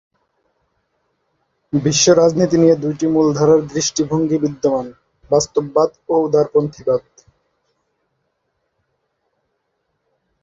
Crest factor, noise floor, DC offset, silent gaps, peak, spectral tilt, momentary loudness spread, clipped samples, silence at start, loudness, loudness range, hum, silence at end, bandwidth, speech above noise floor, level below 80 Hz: 18 dB; -71 dBFS; under 0.1%; none; -2 dBFS; -5 dB/octave; 8 LU; under 0.1%; 1.75 s; -16 LUFS; 8 LU; none; 3.45 s; 7.8 kHz; 55 dB; -54 dBFS